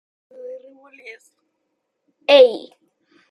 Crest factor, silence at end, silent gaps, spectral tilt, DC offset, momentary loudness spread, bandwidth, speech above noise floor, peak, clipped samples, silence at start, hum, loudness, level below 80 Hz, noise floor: 20 dB; 0.75 s; none; -2.5 dB/octave; under 0.1%; 28 LU; 10 kHz; 58 dB; -2 dBFS; under 0.1%; 0.45 s; none; -14 LUFS; -74 dBFS; -75 dBFS